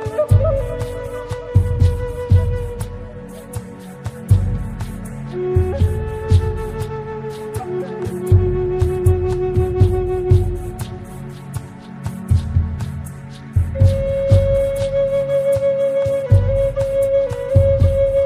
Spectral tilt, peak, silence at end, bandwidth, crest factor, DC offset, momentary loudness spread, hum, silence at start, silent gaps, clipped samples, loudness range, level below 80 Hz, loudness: -8.5 dB/octave; -2 dBFS; 0 s; 13.5 kHz; 16 dB; under 0.1%; 15 LU; none; 0 s; none; under 0.1%; 5 LU; -28 dBFS; -18 LUFS